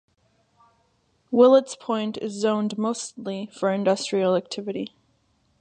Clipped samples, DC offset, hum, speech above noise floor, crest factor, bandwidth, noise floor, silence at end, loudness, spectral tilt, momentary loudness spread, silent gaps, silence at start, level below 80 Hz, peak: under 0.1%; under 0.1%; none; 44 dB; 20 dB; 9.6 kHz; -67 dBFS; 0.75 s; -23 LUFS; -5 dB/octave; 15 LU; none; 1.3 s; -74 dBFS; -4 dBFS